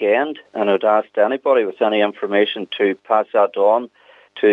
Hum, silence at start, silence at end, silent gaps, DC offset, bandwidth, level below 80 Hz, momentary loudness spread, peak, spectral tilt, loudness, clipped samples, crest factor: none; 0 s; 0 s; none; under 0.1%; 4.1 kHz; -78 dBFS; 5 LU; -2 dBFS; -6.5 dB/octave; -18 LUFS; under 0.1%; 16 dB